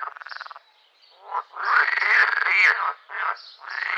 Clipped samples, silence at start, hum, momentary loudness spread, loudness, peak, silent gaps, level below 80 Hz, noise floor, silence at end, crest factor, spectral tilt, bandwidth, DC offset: under 0.1%; 0 s; none; 20 LU; -20 LUFS; -6 dBFS; none; under -90 dBFS; -58 dBFS; 0 s; 18 dB; 4.5 dB/octave; 9.6 kHz; under 0.1%